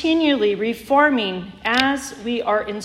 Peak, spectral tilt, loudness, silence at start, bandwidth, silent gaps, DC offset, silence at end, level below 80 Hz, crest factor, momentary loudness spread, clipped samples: 0 dBFS; -4 dB/octave; -19 LUFS; 0 s; 15 kHz; none; under 0.1%; 0 s; -52 dBFS; 18 dB; 10 LU; under 0.1%